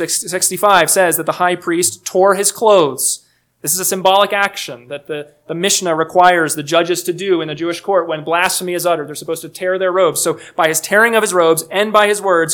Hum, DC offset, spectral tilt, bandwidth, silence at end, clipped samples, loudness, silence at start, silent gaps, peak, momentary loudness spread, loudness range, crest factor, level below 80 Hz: none; under 0.1%; -2.5 dB/octave; 19.5 kHz; 0 s; 0.1%; -14 LUFS; 0 s; none; 0 dBFS; 12 LU; 3 LU; 14 dB; -62 dBFS